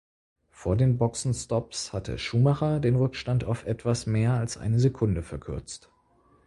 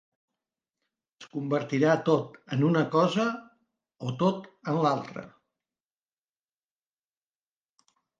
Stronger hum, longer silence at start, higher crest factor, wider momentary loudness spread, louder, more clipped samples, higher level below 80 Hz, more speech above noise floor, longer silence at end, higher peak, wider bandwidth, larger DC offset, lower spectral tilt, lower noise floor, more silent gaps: neither; second, 0.6 s vs 1.2 s; about the same, 16 dB vs 20 dB; about the same, 12 LU vs 14 LU; about the same, -27 LUFS vs -27 LUFS; neither; first, -46 dBFS vs -76 dBFS; second, 37 dB vs over 64 dB; second, 0.7 s vs 2.9 s; about the same, -10 dBFS vs -10 dBFS; first, 11.5 kHz vs 7.6 kHz; neither; about the same, -6.5 dB/octave vs -7 dB/octave; second, -63 dBFS vs under -90 dBFS; neither